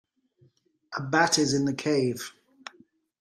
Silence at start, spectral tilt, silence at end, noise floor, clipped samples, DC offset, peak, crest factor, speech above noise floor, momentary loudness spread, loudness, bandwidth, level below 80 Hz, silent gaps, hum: 0.9 s; -4 dB/octave; 0.9 s; -64 dBFS; under 0.1%; under 0.1%; -8 dBFS; 20 dB; 39 dB; 24 LU; -25 LUFS; 14.5 kHz; -68 dBFS; none; none